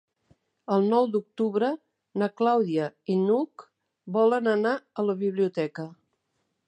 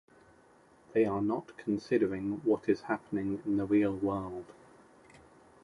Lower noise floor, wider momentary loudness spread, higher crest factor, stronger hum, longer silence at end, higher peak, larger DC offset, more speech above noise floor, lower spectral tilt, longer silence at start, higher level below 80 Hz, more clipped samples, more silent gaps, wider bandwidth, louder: first, -77 dBFS vs -62 dBFS; first, 12 LU vs 8 LU; about the same, 16 dB vs 18 dB; neither; second, 0.75 s vs 1.1 s; first, -10 dBFS vs -14 dBFS; neither; first, 52 dB vs 31 dB; about the same, -8 dB/octave vs -8 dB/octave; second, 0.7 s vs 0.95 s; second, -80 dBFS vs -64 dBFS; neither; neither; second, 9.2 kHz vs 11 kHz; first, -26 LUFS vs -32 LUFS